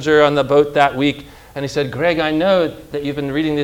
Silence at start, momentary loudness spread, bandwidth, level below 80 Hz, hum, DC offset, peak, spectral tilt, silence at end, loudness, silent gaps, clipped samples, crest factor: 0 s; 12 LU; 16.5 kHz; -46 dBFS; none; under 0.1%; 0 dBFS; -6 dB/octave; 0 s; -17 LUFS; none; under 0.1%; 16 dB